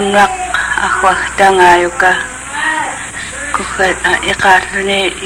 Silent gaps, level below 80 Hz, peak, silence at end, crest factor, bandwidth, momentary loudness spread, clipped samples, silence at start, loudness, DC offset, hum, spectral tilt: none; -36 dBFS; 0 dBFS; 0 s; 12 dB; 16.5 kHz; 11 LU; 0.1%; 0 s; -11 LUFS; under 0.1%; none; -2.5 dB/octave